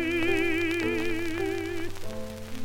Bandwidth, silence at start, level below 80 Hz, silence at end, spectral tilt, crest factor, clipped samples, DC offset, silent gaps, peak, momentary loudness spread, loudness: 17 kHz; 0 s; -44 dBFS; 0 s; -5 dB/octave; 16 dB; under 0.1%; under 0.1%; none; -12 dBFS; 13 LU; -29 LUFS